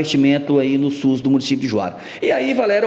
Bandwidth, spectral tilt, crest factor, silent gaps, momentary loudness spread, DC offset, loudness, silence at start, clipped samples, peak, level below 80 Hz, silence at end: 7.8 kHz; -6 dB/octave; 14 dB; none; 7 LU; under 0.1%; -18 LUFS; 0 s; under 0.1%; -4 dBFS; -60 dBFS; 0 s